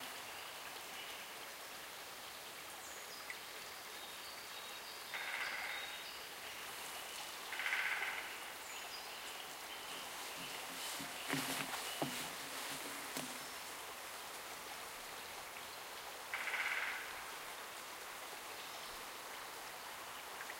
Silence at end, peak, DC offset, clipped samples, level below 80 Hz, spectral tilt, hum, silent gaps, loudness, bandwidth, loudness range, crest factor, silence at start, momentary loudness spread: 0 s; -22 dBFS; under 0.1%; under 0.1%; -78 dBFS; -1 dB/octave; none; none; -44 LUFS; 16 kHz; 5 LU; 26 dB; 0 s; 9 LU